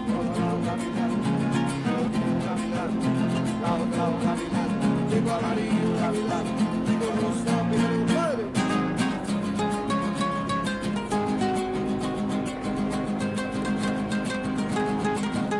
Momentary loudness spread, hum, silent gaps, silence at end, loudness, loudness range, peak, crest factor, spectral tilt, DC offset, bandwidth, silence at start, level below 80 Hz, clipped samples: 4 LU; none; none; 0 s; -26 LUFS; 2 LU; -12 dBFS; 14 dB; -6 dB/octave; under 0.1%; 11.5 kHz; 0 s; -50 dBFS; under 0.1%